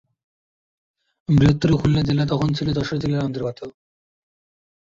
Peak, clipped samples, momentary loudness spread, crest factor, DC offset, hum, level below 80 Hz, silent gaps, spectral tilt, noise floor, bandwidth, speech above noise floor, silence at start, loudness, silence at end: -4 dBFS; under 0.1%; 15 LU; 18 dB; under 0.1%; none; -42 dBFS; none; -7.5 dB/octave; under -90 dBFS; 7.6 kHz; over 71 dB; 1.3 s; -20 LUFS; 1.2 s